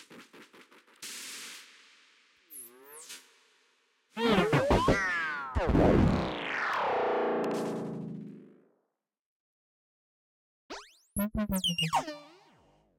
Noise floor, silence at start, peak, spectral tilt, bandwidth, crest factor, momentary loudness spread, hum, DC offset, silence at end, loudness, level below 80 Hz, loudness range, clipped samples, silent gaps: -82 dBFS; 0 s; -12 dBFS; -5 dB/octave; 16.5 kHz; 20 dB; 22 LU; none; under 0.1%; 0.7 s; -29 LUFS; -46 dBFS; 18 LU; under 0.1%; 9.19-10.69 s